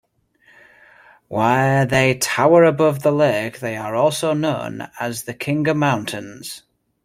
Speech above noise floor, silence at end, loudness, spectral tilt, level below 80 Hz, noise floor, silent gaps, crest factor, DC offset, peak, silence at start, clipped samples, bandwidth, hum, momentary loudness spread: 39 dB; 0.45 s; -18 LUFS; -5.5 dB/octave; -56 dBFS; -57 dBFS; none; 18 dB; under 0.1%; -2 dBFS; 1.3 s; under 0.1%; 16.5 kHz; none; 16 LU